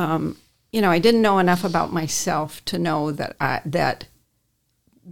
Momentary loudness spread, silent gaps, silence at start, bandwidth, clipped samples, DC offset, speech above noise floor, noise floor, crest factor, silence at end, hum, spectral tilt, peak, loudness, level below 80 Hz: 10 LU; none; 0 s; 18 kHz; under 0.1%; 0.7%; 49 dB; -69 dBFS; 18 dB; 0 s; none; -5 dB/octave; -4 dBFS; -21 LUFS; -54 dBFS